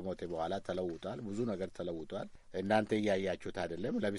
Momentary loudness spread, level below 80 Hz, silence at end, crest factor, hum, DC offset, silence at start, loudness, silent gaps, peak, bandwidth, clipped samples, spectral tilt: 10 LU; -62 dBFS; 0 s; 20 dB; none; under 0.1%; 0 s; -37 LUFS; none; -16 dBFS; 11.5 kHz; under 0.1%; -6.5 dB/octave